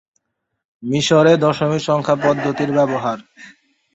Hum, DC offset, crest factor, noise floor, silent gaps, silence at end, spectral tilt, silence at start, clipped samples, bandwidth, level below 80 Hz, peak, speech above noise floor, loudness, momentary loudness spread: none; under 0.1%; 16 dB; -75 dBFS; none; 0.45 s; -5.5 dB/octave; 0.8 s; under 0.1%; 8.2 kHz; -58 dBFS; -2 dBFS; 59 dB; -17 LUFS; 11 LU